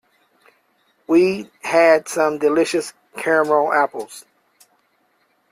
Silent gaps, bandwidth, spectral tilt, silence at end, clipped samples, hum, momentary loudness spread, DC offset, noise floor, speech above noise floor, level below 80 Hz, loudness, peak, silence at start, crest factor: none; 15 kHz; -4.5 dB/octave; 1.3 s; under 0.1%; none; 16 LU; under 0.1%; -64 dBFS; 46 dB; -68 dBFS; -18 LUFS; -4 dBFS; 1.1 s; 16 dB